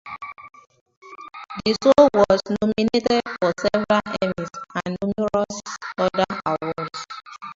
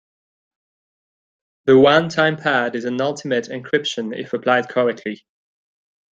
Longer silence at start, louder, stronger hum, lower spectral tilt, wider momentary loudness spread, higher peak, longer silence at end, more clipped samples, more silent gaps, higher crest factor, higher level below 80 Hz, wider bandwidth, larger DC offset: second, 0.05 s vs 1.65 s; second, -21 LUFS vs -18 LUFS; neither; about the same, -5 dB/octave vs -5 dB/octave; first, 20 LU vs 13 LU; about the same, 0 dBFS vs -2 dBFS; second, 0.05 s vs 0.95 s; neither; first, 0.81-0.86 s, 0.97-1.02 s vs none; about the same, 22 dB vs 18 dB; first, -52 dBFS vs -64 dBFS; about the same, 7.8 kHz vs 7.6 kHz; neither